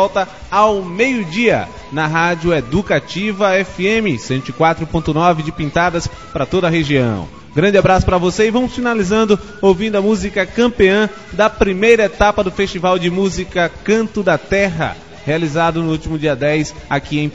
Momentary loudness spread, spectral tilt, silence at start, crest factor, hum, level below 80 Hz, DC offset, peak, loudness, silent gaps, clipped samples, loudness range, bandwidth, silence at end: 7 LU; -5.5 dB/octave; 0 s; 16 dB; none; -34 dBFS; 0.7%; 0 dBFS; -15 LUFS; none; under 0.1%; 3 LU; 8 kHz; 0 s